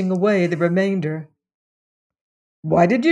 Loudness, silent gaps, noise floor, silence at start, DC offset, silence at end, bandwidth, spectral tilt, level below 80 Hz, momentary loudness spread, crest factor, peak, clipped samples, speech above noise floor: -19 LUFS; 1.54-2.10 s, 2.21-2.63 s; under -90 dBFS; 0 s; under 0.1%; 0 s; 9.8 kHz; -7.5 dB/octave; -58 dBFS; 13 LU; 16 dB; -4 dBFS; under 0.1%; over 72 dB